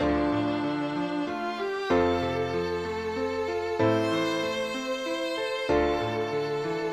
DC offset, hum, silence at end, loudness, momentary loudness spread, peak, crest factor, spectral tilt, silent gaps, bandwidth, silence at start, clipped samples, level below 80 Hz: under 0.1%; none; 0 s; -28 LUFS; 6 LU; -12 dBFS; 16 dB; -5.5 dB/octave; none; 14.5 kHz; 0 s; under 0.1%; -48 dBFS